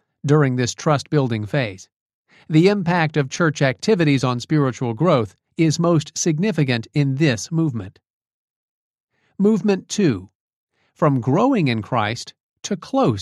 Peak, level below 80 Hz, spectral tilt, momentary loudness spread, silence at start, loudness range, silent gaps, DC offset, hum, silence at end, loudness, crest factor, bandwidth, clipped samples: -2 dBFS; -60 dBFS; -6 dB/octave; 8 LU; 0.25 s; 4 LU; 1.92-2.25 s, 8.10-8.21 s, 8.34-8.94 s, 9.00-9.08 s, 10.35-10.48 s, 10.56-10.67 s, 12.40-12.54 s; under 0.1%; none; 0 s; -19 LUFS; 16 dB; 11.5 kHz; under 0.1%